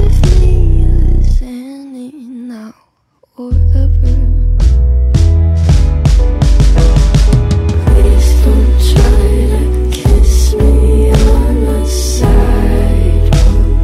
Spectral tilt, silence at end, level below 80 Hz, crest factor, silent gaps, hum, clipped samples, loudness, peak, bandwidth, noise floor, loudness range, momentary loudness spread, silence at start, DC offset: -7 dB/octave; 0 s; -8 dBFS; 8 dB; none; none; under 0.1%; -11 LUFS; 0 dBFS; 13.5 kHz; -54 dBFS; 7 LU; 10 LU; 0 s; under 0.1%